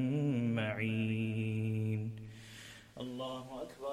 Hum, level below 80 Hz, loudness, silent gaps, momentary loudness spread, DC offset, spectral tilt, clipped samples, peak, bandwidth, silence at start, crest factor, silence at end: none; -68 dBFS; -37 LUFS; none; 17 LU; under 0.1%; -7.5 dB/octave; under 0.1%; -22 dBFS; 12.5 kHz; 0 s; 14 dB; 0 s